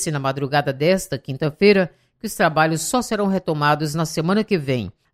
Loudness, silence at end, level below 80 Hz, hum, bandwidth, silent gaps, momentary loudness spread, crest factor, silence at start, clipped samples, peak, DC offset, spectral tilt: -20 LUFS; 0.25 s; -52 dBFS; none; 16 kHz; none; 9 LU; 18 dB; 0 s; under 0.1%; -2 dBFS; under 0.1%; -5 dB/octave